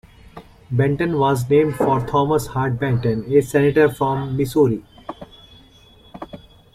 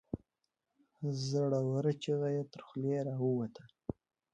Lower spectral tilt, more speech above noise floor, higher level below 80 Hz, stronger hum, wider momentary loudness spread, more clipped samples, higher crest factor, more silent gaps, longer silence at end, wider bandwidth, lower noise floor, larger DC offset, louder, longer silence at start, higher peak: about the same, -7.5 dB/octave vs -7.5 dB/octave; second, 31 dB vs 52 dB; first, -46 dBFS vs -66 dBFS; neither; first, 21 LU vs 14 LU; neither; about the same, 16 dB vs 16 dB; neither; about the same, 0.4 s vs 0.4 s; first, 15.5 kHz vs 8.8 kHz; second, -49 dBFS vs -86 dBFS; neither; first, -19 LUFS vs -36 LUFS; first, 0.35 s vs 0.15 s; first, -4 dBFS vs -20 dBFS